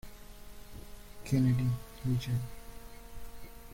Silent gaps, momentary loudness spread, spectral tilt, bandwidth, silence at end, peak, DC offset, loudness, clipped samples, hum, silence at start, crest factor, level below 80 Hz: none; 23 LU; -7 dB/octave; 16.5 kHz; 0 s; -16 dBFS; under 0.1%; -33 LUFS; under 0.1%; none; 0.05 s; 18 dB; -50 dBFS